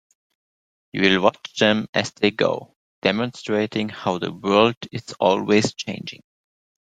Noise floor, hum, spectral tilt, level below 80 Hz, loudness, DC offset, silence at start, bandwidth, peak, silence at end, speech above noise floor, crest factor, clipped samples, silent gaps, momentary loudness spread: under -90 dBFS; none; -4.5 dB/octave; -60 dBFS; -21 LUFS; under 0.1%; 0.95 s; 9.4 kHz; -2 dBFS; 0.65 s; over 69 dB; 22 dB; under 0.1%; 1.89-1.93 s, 2.76-3.02 s, 4.77-4.81 s; 13 LU